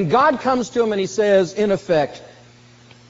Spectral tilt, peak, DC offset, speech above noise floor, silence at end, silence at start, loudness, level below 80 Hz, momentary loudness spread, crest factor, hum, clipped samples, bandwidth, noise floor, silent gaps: -4.5 dB/octave; -4 dBFS; under 0.1%; 29 dB; 0.8 s; 0 s; -18 LUFS; -56 dBFS; 4 LU; 16 dB; none; under 0.1%; 8 kHz; -47 dBFS; none